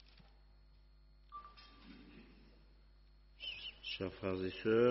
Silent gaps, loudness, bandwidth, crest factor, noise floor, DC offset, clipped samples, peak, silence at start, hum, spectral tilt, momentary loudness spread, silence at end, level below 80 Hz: none; -41 LUFS; 5.8 kHz; 22 dB; -64 dBFS; under 0.1%; under 0.1%; -20 dBFS; 1.3 s; 50 Hz at -65 dBFS; -4 dB/octave; 24 LU; 0 s; -64 dBFS